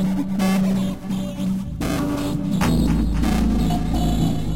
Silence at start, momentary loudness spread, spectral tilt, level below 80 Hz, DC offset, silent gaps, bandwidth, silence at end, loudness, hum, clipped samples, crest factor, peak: 0 s; 6 LU; -6.5 dB/octave; -28 dBFS; 2%; none; 16.5 kHz; 0 s; -22 LUFS; none; under 0.1%; 12 dB; -8 dBFS